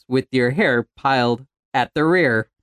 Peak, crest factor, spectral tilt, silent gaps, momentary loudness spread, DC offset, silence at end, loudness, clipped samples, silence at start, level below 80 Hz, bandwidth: -4 dBFS; 16 dB; -6.5 dB/octave; 1.59-1.72 s; 6 LU; under 0.1%; 0.2 s; -19 LUFS; under 0.1%; 0.1 s; -56 dBFS; 11.5 kHz